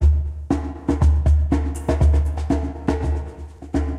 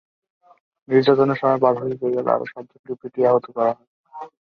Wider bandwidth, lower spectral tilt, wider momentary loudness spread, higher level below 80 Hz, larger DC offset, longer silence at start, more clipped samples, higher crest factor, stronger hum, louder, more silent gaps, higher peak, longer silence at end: first, 9.8 kHz vs 6 kHz; about the same, -8.5 dB/octave vs -8.5 dB/octave; second, 8 LU vs 18 LU; first, -22 dBFS vs -66 dBFS; neither; second, 0 s vs 0.9 s; neither; second, 12 dB vs 18 dB; neither; about the same, -21 LUFS vs -20 LUFS; second, none vs 2.79-2.84 s, 3.87-4.04 s; second, -8 dBFS vs -2 dBFS; second, 0 s vs 0.15 s